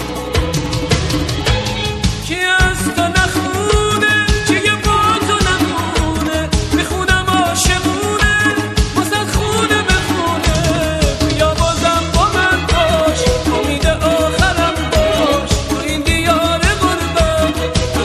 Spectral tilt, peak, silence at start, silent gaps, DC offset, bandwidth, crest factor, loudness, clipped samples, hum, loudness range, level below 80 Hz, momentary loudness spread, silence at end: -4 dB/octave; 0 dBFS; 0 s; none; 0.2%; 13.5 kHz; 14 dB; -14 LUFS; under 0.1%; none; 1 LU; -22 dBFS; 4 LU; 0 s